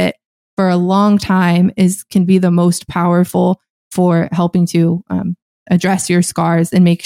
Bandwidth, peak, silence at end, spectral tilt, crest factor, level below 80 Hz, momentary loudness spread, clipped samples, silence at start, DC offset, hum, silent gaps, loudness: 15 kHz; -2 dBFS; 0 s; -6.5 dB/octave; 12 dB; -50 dBFS; 8 LU; under 0.1%; 0 s; under 0.1%; none; 0.26-0.57 s, 3.70-3.91 s, 5.42-5.66 s; -14 LUFS